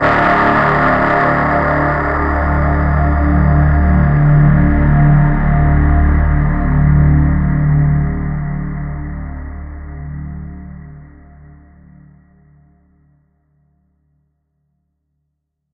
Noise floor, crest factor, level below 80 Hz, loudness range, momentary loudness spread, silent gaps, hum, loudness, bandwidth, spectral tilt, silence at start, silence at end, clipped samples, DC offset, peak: -72 dBFS; 14 dB; -18 dBFS; 18 LU; 17 LU; none; none; -13 LUFS; 5.2 kHz; -10 dB/octave; 0 s; 4.65 s; under 0.1%; under 0.1%; 0 dBFS